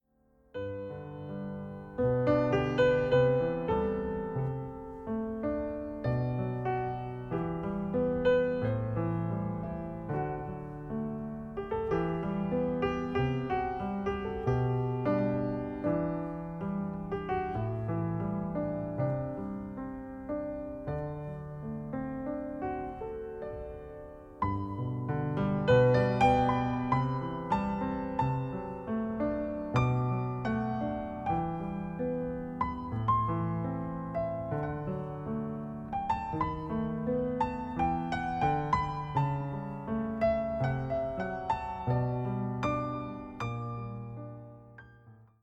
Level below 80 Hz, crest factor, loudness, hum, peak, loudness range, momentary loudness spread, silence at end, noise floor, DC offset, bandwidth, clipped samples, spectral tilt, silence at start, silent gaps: -50 dBFS; 20 dB; -33 LUFS; none; -12 dBFS; 8 LU; 12 LU; 0.15 s; -67 dBFS; under 0.1%; 8 kHz; under 0.1%; -9 dB/octave; 0.55 s; none